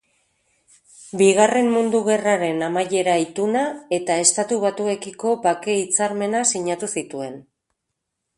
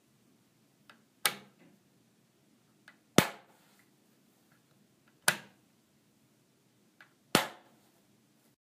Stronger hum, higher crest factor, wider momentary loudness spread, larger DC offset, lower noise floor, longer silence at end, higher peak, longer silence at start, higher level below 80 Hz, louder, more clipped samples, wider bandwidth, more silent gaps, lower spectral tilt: neither; second, 20 dB vs 36 dB; second, 9 LU vs 20 LU; neither; first, -79 dBFS vs -69 dBFS; second, 0.95 s vs 1.2 s; first, 0 dBFS vs -4 dBFS; second, 1 s vs 1.25 s; first, -68 dBFS vs -74 dBFS; first, -20 LUFS vs -32 LUFS; neither; second, 11.5 kHz vs 15.5 kHz; neither; about the same, -3 dB/octave vs -3 dB/octave